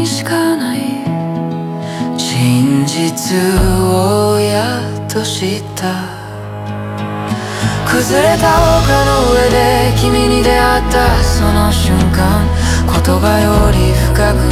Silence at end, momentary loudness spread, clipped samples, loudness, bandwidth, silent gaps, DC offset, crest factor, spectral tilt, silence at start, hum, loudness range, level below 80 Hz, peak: 0 s; 10 LU; under 0.1%; -13 LUFS; 16.5 kHz; none; under 0.1%; 12 dB; -5 dB/octave; 0 s; none; 6 LU; -20 dBFS; 0 dBFS